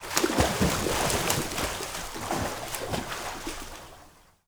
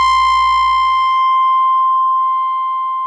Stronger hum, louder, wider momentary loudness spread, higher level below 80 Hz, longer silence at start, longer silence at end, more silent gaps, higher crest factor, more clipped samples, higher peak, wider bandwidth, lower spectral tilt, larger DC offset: second, none vs 60 Hz at -60 dBFS; second, -28 LUFS vs -13 LUFS; first, 13 LU vs 5 LU; about the same, -42 dBFS vs -42 dBFS; about the same, 0 s vs 0 s; first, 0.4 s vs 0 s; neither; first, 30 dB vs 6 dB; neither; first, 0 dBFS vs -6 dBFS; first, over 20 kHz vs 10 kHz; first, -3.5 dB/octave vs 1.5 dB/octave; neither